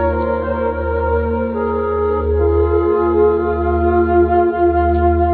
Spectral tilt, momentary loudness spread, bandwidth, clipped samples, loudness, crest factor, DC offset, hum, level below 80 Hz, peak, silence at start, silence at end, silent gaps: -13 dB/octave; 5 LU; 4.4 kHz; under 0.1%; -16 LUFS; 12 dB; under 0.1%; none; -24 dBFS; -2 dBFS; 0 s; 0 s; none